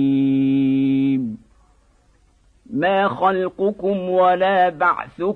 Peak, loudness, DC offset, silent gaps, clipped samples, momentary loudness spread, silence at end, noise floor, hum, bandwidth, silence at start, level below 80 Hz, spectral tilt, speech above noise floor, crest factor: -6 dBFS; -19 LUFS; under 0.1%; none; under 0.1%; 7 LU; 0 s; -57 dBFS; none; 4.3 kHz; 0 s; -56 dBFS; -8.5 dB/octave; 38 dB; 14 dB